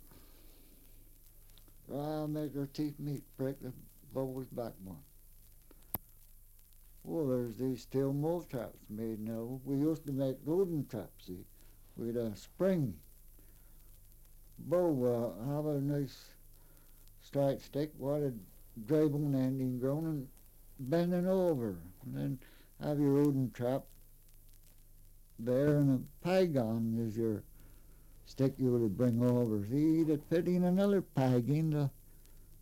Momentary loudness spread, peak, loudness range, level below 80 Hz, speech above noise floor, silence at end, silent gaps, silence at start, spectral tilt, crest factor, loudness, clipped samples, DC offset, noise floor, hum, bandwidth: 14 LU; -18 dBFS; 9 LU; -58 dBFS; 25 dB; 0.05 s; none; 0.05 s; -8.5 dB/octave; 16 dB; -35 LUFS; under 0.1%; under 0.1%; -58 dBFS; none; 16.5 kHz